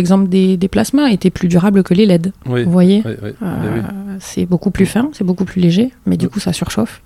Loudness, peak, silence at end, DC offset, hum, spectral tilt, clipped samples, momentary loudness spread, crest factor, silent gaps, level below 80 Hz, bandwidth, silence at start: -14 LUFS; 0 dBFS; 0.1 s; under 0.1%; none; -7 dB/octave; under 0.1%; 10 LU; 14 dB; none; -40 dBFS; 14 kHz; 0 s